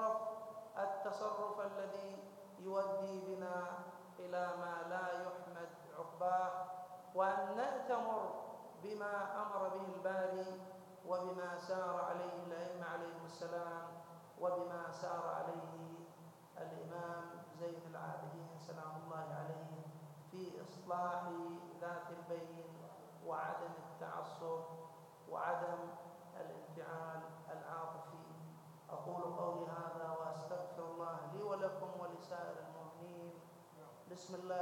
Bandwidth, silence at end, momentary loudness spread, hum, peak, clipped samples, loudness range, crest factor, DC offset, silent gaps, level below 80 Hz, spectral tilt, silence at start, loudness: 17 kHz; 0 s; 14 LU; none; -24 dBFS; under 0.1%; 7 LU; 20 dB; under 0.1%; none; under -90 dBFS; -6 dB/octave; 0 s; -45 LUFS